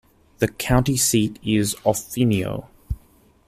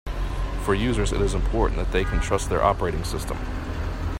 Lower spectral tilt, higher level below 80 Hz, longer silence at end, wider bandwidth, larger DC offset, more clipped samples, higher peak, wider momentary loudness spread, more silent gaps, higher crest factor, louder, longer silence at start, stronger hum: about the same, -4.5 dB/octave vs -5.5 dB/octave; second, -38 dBFS vs -28 dBFS; first, 0.5 s vs 0 s; about the same, 15.5 kHz vs 15.5 kHz; neither; neither; about the same, -4 dBFS vs -4 dBFS; first, 16 LU vs 9 LU; neither; about the same, 18 dB vs 20 dB; first, -21 LUFS vs -25 LUFS; first, 0.4 s vs 0.05 s; neither